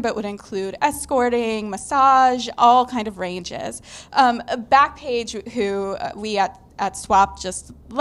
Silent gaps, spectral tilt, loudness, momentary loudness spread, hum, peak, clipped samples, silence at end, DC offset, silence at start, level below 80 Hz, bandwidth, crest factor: none; -3.5 dB/octave; -20 LUFS; 14 LU; none; -2 dBFS; under 0.1%; 0 s; under 0.1%; 0 s; -48 dBFS; 12.5 kHz; 18 dB